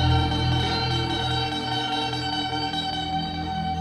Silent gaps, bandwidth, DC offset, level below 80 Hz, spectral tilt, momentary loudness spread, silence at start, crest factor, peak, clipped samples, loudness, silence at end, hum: none; 11.5 kHz; under 0.1%; -38 dBFS; -5 dB/octave; 5 LU; 0 s; 14 dB; -10 dBFS; under 0.1%; -25 LUFS; 0 s; none